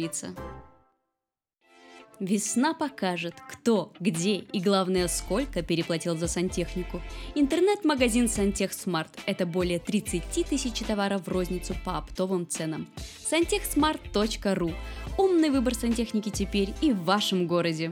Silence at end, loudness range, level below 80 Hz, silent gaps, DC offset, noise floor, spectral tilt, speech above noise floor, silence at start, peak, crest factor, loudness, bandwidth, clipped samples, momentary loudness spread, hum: 0 s; 3 LU; -42 dBFS; none; under 0.1%; -88 dBFS; -4.5 dB/octave; 60 dB; 0 s; -10 dBFS; 18 dB; -27 LUFS; 18.5 kHz; under 0.1%; 10 LU; none